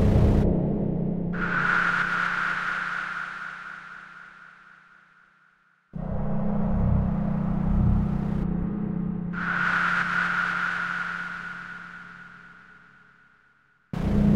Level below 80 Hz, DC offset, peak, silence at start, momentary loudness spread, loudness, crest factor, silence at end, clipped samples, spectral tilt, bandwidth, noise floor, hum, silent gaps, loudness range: -34 dBFS; under 0.1%; -8 dBFS; 0 s; 18 LU; -26 LUFS; 18 dB; 0 s; under 0.1%; -7.5 dB/octave; 9.4 kHz; -63 dBFS; none; none; 10 LU